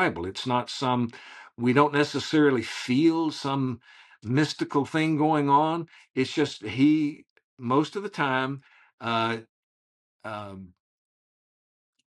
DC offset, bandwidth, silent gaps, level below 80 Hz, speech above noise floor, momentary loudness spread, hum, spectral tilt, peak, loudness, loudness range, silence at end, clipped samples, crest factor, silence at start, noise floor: under 0.1%; 11.5 kHz; 7.30-7.36 s, 7.44-7.57 s, 8.93-8.98 s, 9.49-10.19 s; -70 dBFS; over 65 dB; 16 LU; none; -6 dB/octave; -4 dBFS; -26 LUFS; 7 LU; 1.5 s; under 0.1%; 22 dB; 0 s; under -90 dBFS